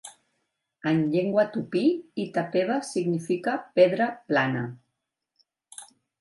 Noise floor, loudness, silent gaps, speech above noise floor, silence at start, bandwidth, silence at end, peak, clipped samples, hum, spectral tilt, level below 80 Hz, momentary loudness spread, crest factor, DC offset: -82 dBFS; -25 LUFS; none; 57 dB; 0.05 s; 11.5 kHz; 0.35 s; -6 dBFS; under 0.1%; none; -6 dB/octave; -74 dBFS; 18 LU; 20 dB; under 0.1%